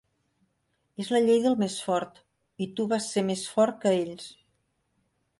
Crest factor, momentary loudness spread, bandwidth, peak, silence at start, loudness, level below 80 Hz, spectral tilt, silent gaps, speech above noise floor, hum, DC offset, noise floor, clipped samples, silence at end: 18 dB; 18 LU; 11.5 kHz; -10 dBFS; 1 s; -27 LUFS; -72 dBFS; -5 dB/octave; none; 49 dB; none; under 0.1%; -75 dBFS; under 0.1%; 1.05 s